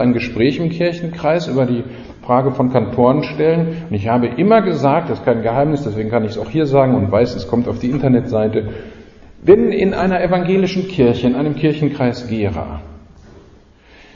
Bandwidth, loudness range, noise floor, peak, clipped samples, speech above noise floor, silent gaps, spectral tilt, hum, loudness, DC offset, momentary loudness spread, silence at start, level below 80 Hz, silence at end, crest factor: 7.4 kHz; 2 LU; -45 dBFS; 0 dBFS; under 0.1%; 30 dB; none; -8.5 dB/octave; none; -16 LUFS; under 0.1%; 8 LU; 0 s; -40 dBFS; 0.75 s; 16 dB